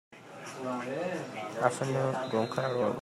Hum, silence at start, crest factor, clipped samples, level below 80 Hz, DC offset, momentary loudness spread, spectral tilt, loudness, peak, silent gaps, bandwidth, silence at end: none; 0.1 s; 22 dB; under 0.1%; -76 dBFS; under 0.1%; 11 LU; -5.5 dB/octave; -32 LUFS; -10 dBFS; none; 14 kHz; 0 s